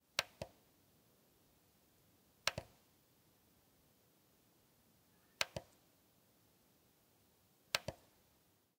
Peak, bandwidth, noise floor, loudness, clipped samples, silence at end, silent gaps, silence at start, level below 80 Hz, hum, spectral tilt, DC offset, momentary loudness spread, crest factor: -14 dBFS; 16 kHz; -75 dBFS; -43 LUFS; under 0.1%; 0.85 s; none; 0.2 s; -76 dBFS; none; -1.5 dB/octave; under 0.1%; 12 LU; 38 dB